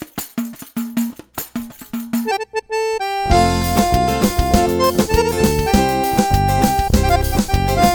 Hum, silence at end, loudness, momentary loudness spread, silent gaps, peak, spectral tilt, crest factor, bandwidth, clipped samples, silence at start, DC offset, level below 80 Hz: none; 0 s; -17 LUFS; 12 LU; none; 0 dBFS; -5 dB/octave; 16 dB; 19.5 kHz; under 0.1%; 0 s; under 0.1%; -26 dBFS